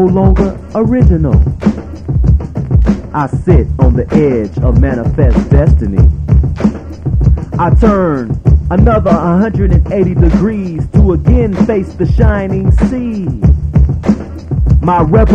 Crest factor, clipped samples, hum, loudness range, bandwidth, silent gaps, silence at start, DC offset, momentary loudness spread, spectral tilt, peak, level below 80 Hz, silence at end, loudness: 10 dB; 0.7%; none; 2 LU; 6.8 kHz; none; 0 s; under 0.1%; 6 LU; -10 dB/octave; 0 dBFS; -14 dBFS; 0 s; -11 LUFS